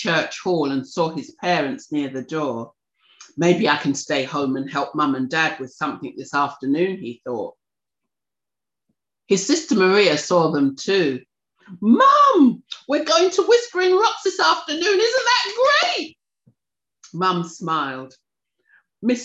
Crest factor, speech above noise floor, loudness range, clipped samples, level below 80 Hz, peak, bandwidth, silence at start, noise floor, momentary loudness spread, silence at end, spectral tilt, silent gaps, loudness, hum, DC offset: 16 dB; 70 dB; 9 LU; under 0.1%; -70 dBFS; -4 dBFS; 8.4 kHz; 0 s; -89 dBFS; 12 LU; 0 s; -4 dB/octave; none; -19 LUFS; none; under 0.1%